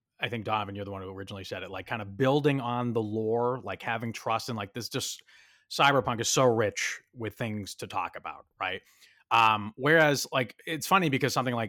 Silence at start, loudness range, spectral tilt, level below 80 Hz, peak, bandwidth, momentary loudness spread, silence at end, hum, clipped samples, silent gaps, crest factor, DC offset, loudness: 0.2 s; 4 LU; -4 dB/octave; -68 dBFS; -10 dBFS; 18 kHz; 14 LU; 0 s; none; under 0.1%; none; 20 dB; under 0.1%; -28 LUFS